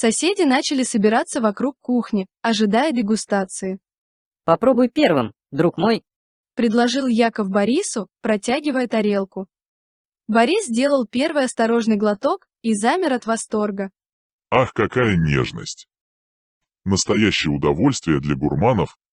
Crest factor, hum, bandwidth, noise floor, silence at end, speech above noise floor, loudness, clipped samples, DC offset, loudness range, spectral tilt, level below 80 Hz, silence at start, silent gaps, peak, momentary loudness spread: 18 dB; none; 11 kHz; under -90 dBFS; 0.25 s; over 71 dB; -20 LUFS; under 0.1%; under 0.1%; 2 LU; -5 dB/octave; -48 dBFS; 0 s; 3.98-4.31 s, 6.16-6.44 s, 9.68-10.12 s, 14.13-14.39 s, 16.01-16.61 s; -2 dBFS; 9 LU